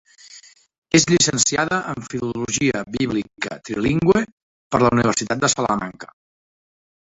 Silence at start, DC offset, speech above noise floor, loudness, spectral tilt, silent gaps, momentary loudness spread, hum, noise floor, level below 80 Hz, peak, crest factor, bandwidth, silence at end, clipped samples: 0.3 s; under 0.1%; 27 dB; -19 LUFS; -3.5 dB/octave; 0.78-0.82 s, 4.32-4.70 s; 12 LU; none; -47 dBFS; -48 dBFS; -2 dBFS; 20 dB; 8.4 kHz; 1.15 s; under 0.1%